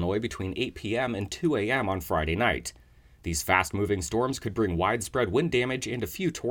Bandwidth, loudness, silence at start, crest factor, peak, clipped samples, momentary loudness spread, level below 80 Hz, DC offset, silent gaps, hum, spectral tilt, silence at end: 18 kHz; -28 LUFS; 0 s; 22 dB; -6 dBFS; under 0.1%; 7 LU; -48 dBFS; under 0.1%; none; none; -5 dB/octave; 0 s